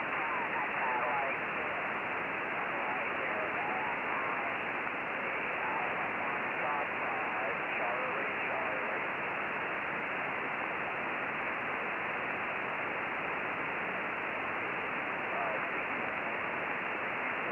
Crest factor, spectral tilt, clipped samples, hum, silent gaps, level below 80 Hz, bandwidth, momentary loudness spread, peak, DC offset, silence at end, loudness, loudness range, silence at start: 16 dB; -6 dB/octave; under 0.1%; none; none; -72 dBFS; 16.5 kHz; 2 LU; -18 dBFS; under 0.1%; 0 s; -34 LUFS; 1 LU; 0 s